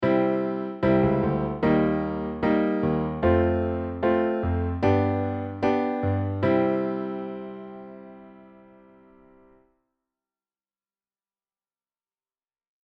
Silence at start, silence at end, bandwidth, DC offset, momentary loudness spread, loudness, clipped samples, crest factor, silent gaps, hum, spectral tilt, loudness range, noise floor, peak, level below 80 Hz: 0 s; 4.4 s; 6.2 kHz; under 0.1%; 13 LU; -25 LUFS; under 0.1%; 16 dB; none; none; -10 dB/octave; 10 LU; under -90 dBFS; -10 dBFS; -46 dBFS